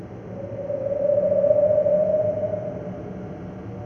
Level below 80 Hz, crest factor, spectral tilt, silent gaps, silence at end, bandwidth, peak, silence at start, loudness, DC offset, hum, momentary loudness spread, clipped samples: -52 dBFS; 16 dB; -10 dB/octave; none; 0 s; 3.3 kHz; -8 dBFS; 0 s; -22 LUFS; under 0.1%; none; 17 LU; under 0.1%